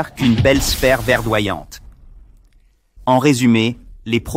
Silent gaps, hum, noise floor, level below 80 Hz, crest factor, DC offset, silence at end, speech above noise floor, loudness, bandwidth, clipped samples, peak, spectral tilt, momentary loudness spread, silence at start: none; none; -53 dBFS; -32 dBFS; 16 dB; under 0.1%; 0 s; 38 dB; -16 LUFS; 16.5 kHz; under 0.1%; 0 dBFS; -5 dB/octave; 10 LU; 0 s